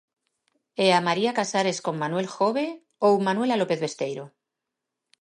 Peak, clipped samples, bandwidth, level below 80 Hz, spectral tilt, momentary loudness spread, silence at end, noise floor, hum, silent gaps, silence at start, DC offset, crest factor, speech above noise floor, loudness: -8 dBFS; under 0.1%; 11.5 kHz; -78 dBFS; -4.5 dB/octave; 11 LU; 0.9 s; -85 dBFS; none; none; 0.8 s; under 0.1%; 18 dB; 61 dB; -24 LUFS